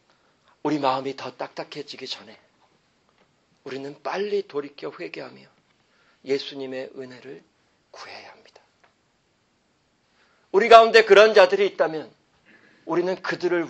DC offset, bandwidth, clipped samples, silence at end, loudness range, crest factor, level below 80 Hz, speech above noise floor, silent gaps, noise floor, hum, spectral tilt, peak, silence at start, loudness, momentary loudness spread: under 0.1%; 8.2 kHz; under 0.1%; 0 s; 17 LU; 24 dB; -70 dBFS; 46 dB; none; -67 dBFS; none; -4 dB/octave; 0 dBFS; 0.65 s; -20 LUFS; 26 LU